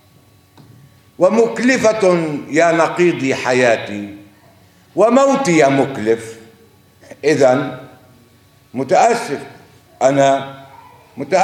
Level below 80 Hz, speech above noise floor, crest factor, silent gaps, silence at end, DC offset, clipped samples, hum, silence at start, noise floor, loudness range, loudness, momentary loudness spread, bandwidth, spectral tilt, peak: -64 dBFS; 36 dB; 16 dB; none; 0 s; under 0.1%; under 0.1%; none; 1.2 s; -50 dBFS; 4 LU; -15 LUFS; 15 LU; 14.5 kHz; -5 dB/octave; 0 dBFS